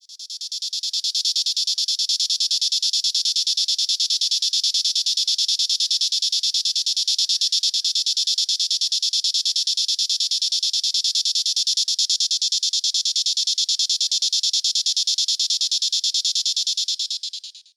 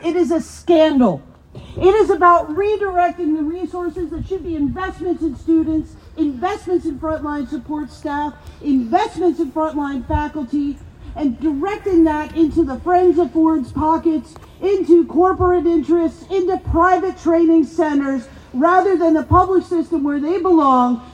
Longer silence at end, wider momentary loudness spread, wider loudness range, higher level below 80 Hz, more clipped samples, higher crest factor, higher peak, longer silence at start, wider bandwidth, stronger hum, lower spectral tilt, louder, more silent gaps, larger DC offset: first, 0.15 s vs 0 s; second, 2 LU vs 11 LU; second, 1 LU vs 6 LU; second, under -90 dBFS vs -38 dBFS; neither; about the same, 16 dB vs 16 dB; second, -6 dBFS vs 0 dBFS; about the same, 0.1 s vs 0 s; first, 16.5 kHz vs 9.8 kHz; neither; second, 13 dB/octave vs -7.5 dB/octave; about the same, -19 LUFS vs -17 LUFS; neither; neither